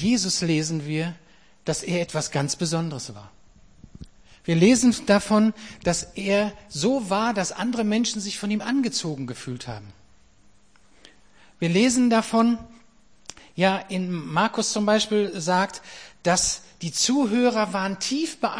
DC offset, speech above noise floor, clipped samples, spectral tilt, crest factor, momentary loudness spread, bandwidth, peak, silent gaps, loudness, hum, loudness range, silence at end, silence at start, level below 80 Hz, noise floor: 0.2%; 36 dB; under 0.1%; -4 dB/octave; 20 dB; 13 LU; 10.5 kHz; -6 dBFS; none; -23 LUFS; none; 6 LU; 0 s; 0 s; -54 dBFS; -59 dBFS